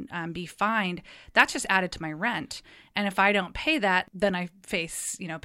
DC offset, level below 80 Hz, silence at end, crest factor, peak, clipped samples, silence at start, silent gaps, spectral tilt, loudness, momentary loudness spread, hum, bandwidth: under 0.1%; -54 dBFS; 0.05 s; 24 dB; -4 dBFS; under 0.1%; 0 s; none; -3.5 dB/octave; -26 LUFS; 12 LU; none; 16 kHz